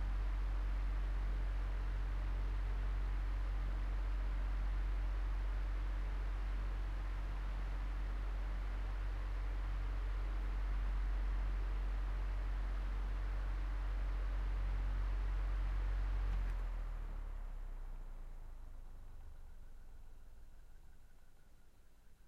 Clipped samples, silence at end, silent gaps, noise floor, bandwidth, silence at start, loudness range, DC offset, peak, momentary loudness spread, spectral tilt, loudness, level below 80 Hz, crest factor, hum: under 0.1%; 0 s; none; -60 dBFS; 5.4 kHz; 0 s; 13 LU; under 0.1%; -30 dBFS; 15 LU; -7 dB/octave; -43 LUFS; -40 dBFS; 8 dB; none